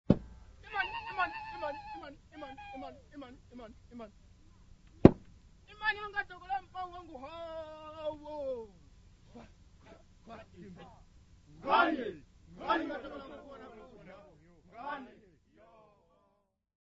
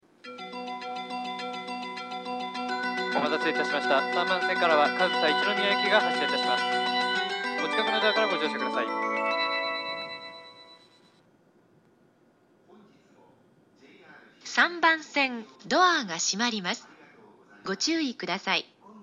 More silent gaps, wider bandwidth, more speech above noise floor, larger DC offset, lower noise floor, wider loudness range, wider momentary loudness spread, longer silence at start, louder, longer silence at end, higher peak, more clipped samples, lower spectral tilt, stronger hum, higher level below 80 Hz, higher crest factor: neither; second, 7.6 kHz vs 10 kHz; about the same, 37 dB vs 37 dB; neither; first, -76 dBFS vs -63 dBFS; first, 17 LU vs 9 LU; first, 25 LU vs 14 LU; second, 0.1 s vs 0.25 s; second, -34 LUFS vs -26 LUFS; first, 1.7 s vs 0 s; first, -2 dBFS vs -8 dBFS; neither; first, -5 dB/octave vs -2 dB/octave; neither; first, -54 dBFS vs -78 dBFS; first, 36 dB vs 22 dB